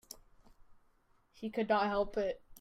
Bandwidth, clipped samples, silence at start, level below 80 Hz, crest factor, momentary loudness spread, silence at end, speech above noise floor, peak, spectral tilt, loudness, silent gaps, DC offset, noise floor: 16 kHz; under 0.1%; 0.1 s; -60 dBFS; 18 dB; 20 LU; 0.05 s; 37 dB; -20 dBFS; -5 dB/octave; -35 LUFS; none; under 0.1%; -70 dBFS